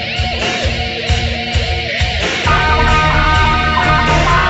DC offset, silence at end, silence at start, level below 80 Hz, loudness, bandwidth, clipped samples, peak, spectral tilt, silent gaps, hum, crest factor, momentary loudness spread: under 0.1%; 0 s; 0 s; -20 dBFS; -13 LUFS; 8.2 kHz; under 0.1%; 0 dBFS; -4.5 dB/octave; none; none; 12 dB; 5 LU